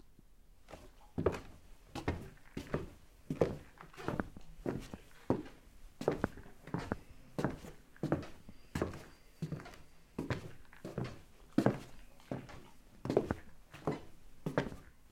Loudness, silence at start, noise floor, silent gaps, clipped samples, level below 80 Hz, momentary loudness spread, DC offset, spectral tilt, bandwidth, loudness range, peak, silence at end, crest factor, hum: -41 LUFS; 0.05 s; -60 dBFS; none; under 0.1%; -56 dBFS; 20 LU; under 0.1%; -7 dB/octave; 16.5 kHz; 4 LU; -12 dBFS; 0 s; 28 dB; none